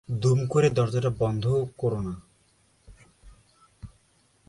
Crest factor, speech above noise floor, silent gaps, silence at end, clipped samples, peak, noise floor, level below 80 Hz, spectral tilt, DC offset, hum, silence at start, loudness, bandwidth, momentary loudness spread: 18 dB; 40 dB; none; 0.6 s; under 0.1%; -10 dBFS; -64 dBFS; -52 dBFS; -7 dB/octave; under 0.1%; none; 0.1 s; -25 LUFS; 11.5 kHz; 10 LU